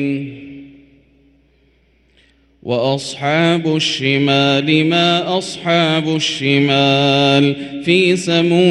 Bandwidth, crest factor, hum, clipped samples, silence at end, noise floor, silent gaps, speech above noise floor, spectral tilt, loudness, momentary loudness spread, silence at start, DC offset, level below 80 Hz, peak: 11.5 kHz; 16 dB; none; under 0.1%; 0 s; -55 dBFS; none; 41 dB; -5 dB/octave; -14 LUFS; 9 LU; 0 s; under 0.1%; -56 dBFS; 0 dBFS